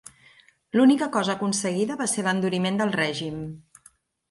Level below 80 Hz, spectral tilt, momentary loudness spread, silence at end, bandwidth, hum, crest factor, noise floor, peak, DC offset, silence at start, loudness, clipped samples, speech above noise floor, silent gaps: -64 dBFS; -4.5 dB/octave; 14 LU; 0.7 s; 11.5 kHz; none; 16 dB; -58 dBFS; -8 dBFS; under 0.1%; 0.75 s; -24 LUFS; under 0.1%; 35 dB; none